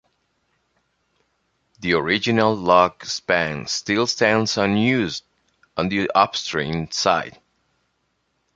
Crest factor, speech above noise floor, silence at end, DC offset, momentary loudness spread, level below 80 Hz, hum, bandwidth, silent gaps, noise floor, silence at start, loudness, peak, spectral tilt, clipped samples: 20 dB; 51 dB; 1.25 s; under 0.1%; 10 LU; -52 dBFS; none; 9.2 kHz; none; -71 dBFS; 1.8 s; -20 LUFS; -2 dBFS; -4 dB/octave; under 0.1%